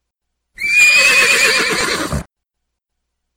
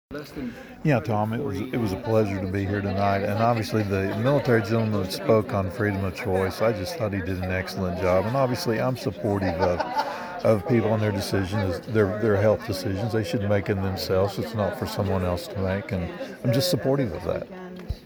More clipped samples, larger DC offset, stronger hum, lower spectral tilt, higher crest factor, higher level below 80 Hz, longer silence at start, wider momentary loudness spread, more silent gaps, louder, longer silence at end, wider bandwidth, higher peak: neither; neither; neither; second, -1 dB/octave vs -6.5 dB/octave; about the same, 16 dB vs 18 dB; first, -40 dBFS vs -50 dBFS; first, 0.6 s vs 0.1 s; first, 15 LU vs 7 LU; neither; first, -10 LUFS vs -25 LUFS; first, 1.15 s vs 0 s; second, 17 kHz vs over 20 kHz; first, 0 dBFS vs -6 dBFS